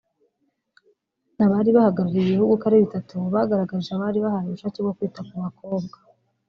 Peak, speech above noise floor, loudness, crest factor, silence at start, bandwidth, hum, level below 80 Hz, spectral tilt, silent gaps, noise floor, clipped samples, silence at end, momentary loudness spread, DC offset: -6 dBFS; 51 dB; -22 LUFS; 18 dB; 1.4 s; 6.4 kHz; none; -62 dBFS; -8 dB/octave; none; -73 dBFS; under 0.1%; 0.6 s; 13 LU; under 0.1%